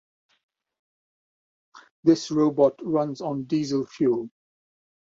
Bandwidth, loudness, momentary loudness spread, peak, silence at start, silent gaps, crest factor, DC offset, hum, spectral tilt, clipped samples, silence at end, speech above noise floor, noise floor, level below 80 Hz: 7.8 kHz; -24 LUFS; 8 LU; -6 dBFS; 1.75 s; 1.91-2.03 s; 20 dB; under 0.1%; none; -6.5 dB/octave; under 0.1%; 0.75 s; over 67 dB; under -90 dBFS; -68 dBFS